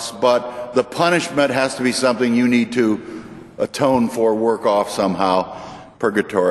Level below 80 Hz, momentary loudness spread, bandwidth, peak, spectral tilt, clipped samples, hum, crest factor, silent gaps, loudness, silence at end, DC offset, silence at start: -56 dBFS; 9 LU; 12.5 kHz; -2 dBFS; -4.5 dB/octave; under 0.1%; none; 16 dB; none; -18 LUFS; 0 s; under 0.1%; 0 s